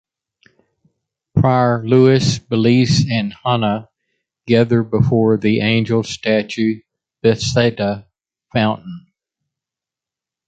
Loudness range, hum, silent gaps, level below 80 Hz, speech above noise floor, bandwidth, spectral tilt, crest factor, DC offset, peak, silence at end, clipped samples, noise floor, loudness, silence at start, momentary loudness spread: 5 LU; none; none; -46 dBFS; 72 dB; 9 kHz; -6.5 dB/octave; 16 dB; under 0.1%; -2 dBFS; 1.5 s; under 0.1%; -87 dBFS; -16 LUFS; 1.35 s; 9 LU